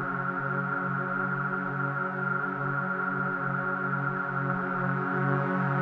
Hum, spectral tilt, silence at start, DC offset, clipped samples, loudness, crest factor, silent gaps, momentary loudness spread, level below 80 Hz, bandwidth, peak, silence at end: none; -10 dB/octave; 0 s; under 0.1%; under 0.1%; -29 LUFS; 16 dB; none; 3 LU; -70 dBFS; 4.7 kHz; -14 dBFS; 0 s